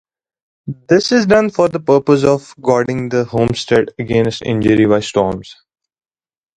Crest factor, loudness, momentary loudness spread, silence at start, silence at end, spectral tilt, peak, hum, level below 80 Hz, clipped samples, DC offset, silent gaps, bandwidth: 14 dB; -14 LUFS; 6 LU; 0.65 s; 1.05 s; -6 dB/octave; 0 dBFS; none; -44 dBFS; under 0.1%; under 0.1%; none; 10.5 kHz